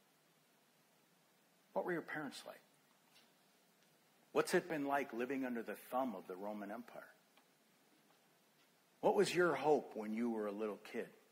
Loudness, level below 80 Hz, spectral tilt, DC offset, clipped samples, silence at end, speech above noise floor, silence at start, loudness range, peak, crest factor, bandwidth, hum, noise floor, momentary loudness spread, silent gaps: -40 LUFS; -90 dBFS; -5 dB/octave; under 0.1%; under 0.1%; 0.2 s; 34 dB; 1.75 s; 10 LU; -20 dBFS; 22 dB; 16 kHz; none; -74 dBFS; 14 LU; none